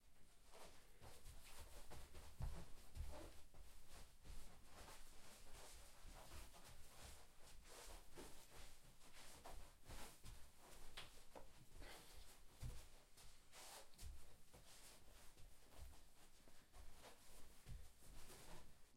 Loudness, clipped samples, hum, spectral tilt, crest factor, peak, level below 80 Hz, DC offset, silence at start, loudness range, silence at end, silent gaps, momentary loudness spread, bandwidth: -63 LUFS; under 0.1%; none; -3.5 dB/octave; 20 dB; -36 dBFS; -62 dBFS; under 0.1%; 0 s; 5 LU; 0 s; none; 8 LU; 16 kHz